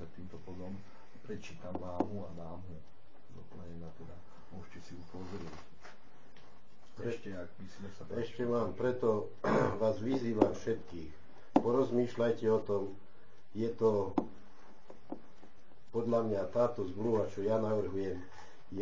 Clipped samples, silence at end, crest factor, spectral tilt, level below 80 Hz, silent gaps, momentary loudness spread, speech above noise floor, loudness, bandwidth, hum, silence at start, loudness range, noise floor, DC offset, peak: under 0.1%; 0 s; 26 dB; -7.5 dB/octave; -62 dBFS; none; 21 LU; 27 dB; -35 LUFS; 7.6 kHz; none; 0 s; 17 LU; -63 dBFS; 0.9%; -10 dBFS